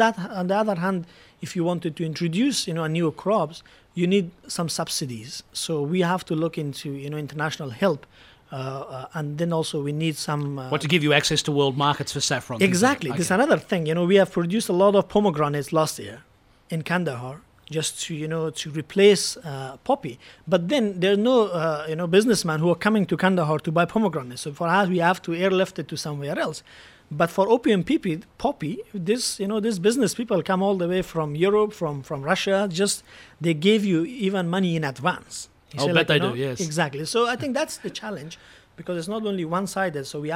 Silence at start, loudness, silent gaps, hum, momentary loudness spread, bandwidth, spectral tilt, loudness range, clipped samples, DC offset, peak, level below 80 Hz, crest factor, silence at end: 0 s; -23 LUFS; none; none; 13 LU; 16.5 kHz; -5 dB/octave; 6 LU; under 0.1%; under 0.1%; -2 dBFS; -60 dBFS; 20 dB; 0 s